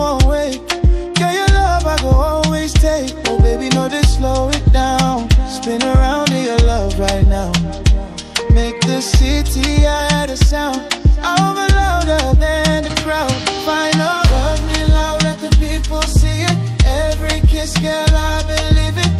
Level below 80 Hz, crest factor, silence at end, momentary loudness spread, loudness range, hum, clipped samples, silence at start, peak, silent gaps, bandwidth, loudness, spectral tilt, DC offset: -16 dBFS; 12 dB; 0 s; 4 LU; 1 LU; none; under 0.1%; 0 s; 0 dBFS; none; 13.5 kHz; -15 LUFS; -5 dB/octave; under 0.1%